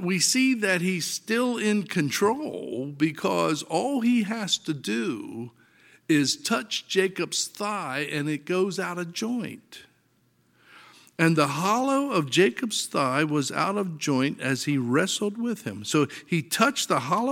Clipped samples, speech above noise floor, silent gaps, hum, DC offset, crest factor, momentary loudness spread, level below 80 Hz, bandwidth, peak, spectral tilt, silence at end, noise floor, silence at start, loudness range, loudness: under 0.1%; 40 dB; none; none; under 0.1%; 22 dB; 9 LU; -74 dBFS; 17 kHz; -4 dBFS; -4 dB/octave; 0 s; -66 dBFS; 0 s; 4 LU; -25 LUFS